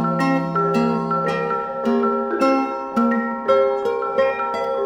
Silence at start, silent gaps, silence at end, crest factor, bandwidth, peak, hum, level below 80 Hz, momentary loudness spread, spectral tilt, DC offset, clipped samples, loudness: 0 s; none; 0 s; 14 dB; 12 kHz; -6 dBFS; none; -60 dBFS; 4 LU; -7 dB/octave; under 0.1%; under 0.1%; -20 LUFS